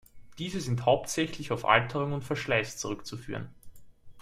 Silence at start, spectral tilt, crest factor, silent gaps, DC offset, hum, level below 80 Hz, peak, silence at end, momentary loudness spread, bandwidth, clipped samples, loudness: 0.15 s; -4.5 dB/octave; 26 dB; none; under 0.1%; none; -56 dBFS; -6 dBFS; 0 s; 15 LU; 15.5 kHz; under 0.1%; -30 LUFS